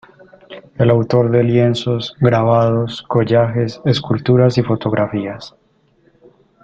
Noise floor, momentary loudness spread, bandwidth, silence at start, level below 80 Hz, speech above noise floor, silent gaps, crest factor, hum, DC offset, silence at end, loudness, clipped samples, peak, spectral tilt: -56 dBFS; 7 LU; 7.6 kHz; 0.5 s; -50 dBFS; 41 dB; none; 14 dB; none; under 0.1%; 1.15 s; -15 LUFS; under 0.1%; -2 dBFS; -8 dB/octave